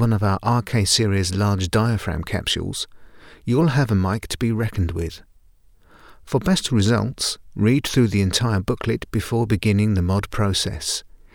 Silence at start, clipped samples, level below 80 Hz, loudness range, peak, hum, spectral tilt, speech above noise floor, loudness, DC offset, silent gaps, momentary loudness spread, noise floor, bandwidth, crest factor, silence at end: 0 s; under 0.1%; -40 dBFS; 3 LU; -4 dBFS; none; -5 dB/octave; 32 dB; -21 LUFS; under 0.1%; none; 7 LU; -52 dBFS; 18 kHz; 16 dB; 0.35 s